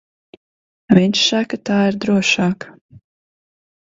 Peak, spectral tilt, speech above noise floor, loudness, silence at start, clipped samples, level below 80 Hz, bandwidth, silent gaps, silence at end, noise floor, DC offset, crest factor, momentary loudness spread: 0 dBFS; -4.5 dB/octave; over 74 dB; -16 LUFS; 0.9 s; under 0.1%; -56 dBFS; 7.8 kHz; 2.81-2.89 s; 1 s; under -90 dBFS; under 0.1%; 18 dB; 7 LU